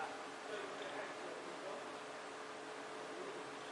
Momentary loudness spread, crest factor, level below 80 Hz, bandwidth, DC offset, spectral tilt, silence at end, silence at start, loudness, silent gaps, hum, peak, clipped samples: 3 LU; 16 dB; under -90 dBFS; 11.5 kHz; under 0.1%; -2.5 dB/octave; 0 s; 0 s; -48 LUFS; none; none; -32 dBFS; under 0.1%